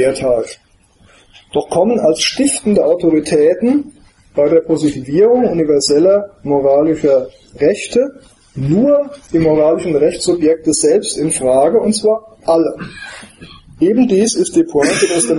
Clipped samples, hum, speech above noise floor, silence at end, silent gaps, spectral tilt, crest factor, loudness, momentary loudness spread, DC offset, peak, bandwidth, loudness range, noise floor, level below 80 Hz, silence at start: under 0.1%; none; 36 dB; 0 s; none; -4.5 dB/octave; 14 dB; -13 LUFS; 8 LU; under 0.1%; 0 dBFS; 11.5 kHz; 2 LU; -49 dBFS; -46 dBFS; 0 s